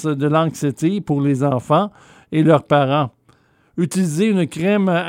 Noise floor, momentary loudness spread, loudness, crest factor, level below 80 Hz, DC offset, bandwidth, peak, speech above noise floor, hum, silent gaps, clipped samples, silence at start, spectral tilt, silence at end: -56 dBFS; 8 LU; -18 LUFS; 16 dB; -60 dBFS; under 0.1%; 16 kHz; -2 dBFS; 39 dB; none; none; under 0.1%; 0 s; -7 dB/octave; 0 s